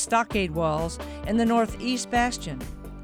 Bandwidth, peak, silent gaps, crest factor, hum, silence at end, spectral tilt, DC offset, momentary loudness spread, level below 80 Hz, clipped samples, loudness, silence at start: 16 kHz; -10 dBFS; none; 16 dB; none; 0 s; -4.5 dB/octave; under 0.1%; 12 LU; -40 dBFS; under 0.1%; -26 LUFS; 0 s